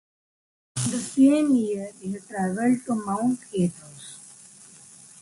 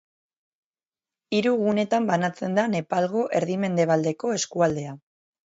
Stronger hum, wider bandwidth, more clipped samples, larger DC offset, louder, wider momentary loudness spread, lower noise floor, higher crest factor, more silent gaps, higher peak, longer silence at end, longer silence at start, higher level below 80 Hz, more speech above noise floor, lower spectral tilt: neither; first, 11.5 kHz vs 8 kHz; neither; neither; about the same, -24 LUFS vs -24 LUFS; first, 24 LU vs 4 LU; second, -49 dBFS vs under -90 dBFS; about the same, 18 dB vs 18 dB; neither; about the same, -8 dBFS vs -8 dBFS; first, 0.95 s vs 0.55 s; second, 0.75 s vs 1.3 s; about the same, -64 dBFS vs -64 dBFS; second, 26 dB vs over 67 dB; about the same, -5.5 dB/octave vs -5.5 dB/octave